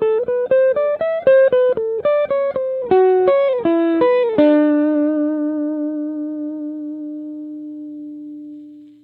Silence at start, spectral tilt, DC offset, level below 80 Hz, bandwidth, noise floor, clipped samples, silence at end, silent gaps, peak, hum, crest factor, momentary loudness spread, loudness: 0 s; -9 dB/octave; under 0.1%; -60 dBFS; 4.4 kHz; -38 dBFS; under 0.1%; 0.15 s; none; -2 dBFS; none; 16 dB; 18 LU; -17 LUFS